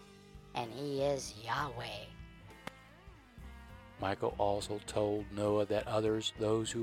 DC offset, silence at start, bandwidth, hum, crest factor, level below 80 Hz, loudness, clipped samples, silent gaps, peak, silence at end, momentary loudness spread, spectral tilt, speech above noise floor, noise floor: under 0.1%; 0 s; 16 kHz; none; 18 dB; -58 dBFS; -36 LUFS; under 0.1%; none; -18 dBFS; 0 s; 21 LU; -5 dB/octave; 22 dB; -57 dBFS